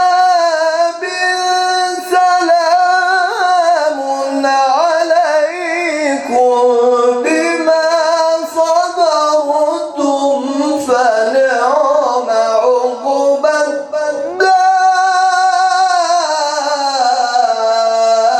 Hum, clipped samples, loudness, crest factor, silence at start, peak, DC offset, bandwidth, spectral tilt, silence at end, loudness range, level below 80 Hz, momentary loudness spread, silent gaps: none; under 0.1%; -12 LUFS; 12 dB; 0 s; 0 dBFS; under 0.1%; 12.5 kHz; -1 dB/octave; 0 s; 1 LU; -66 dBFS; 5 LU; none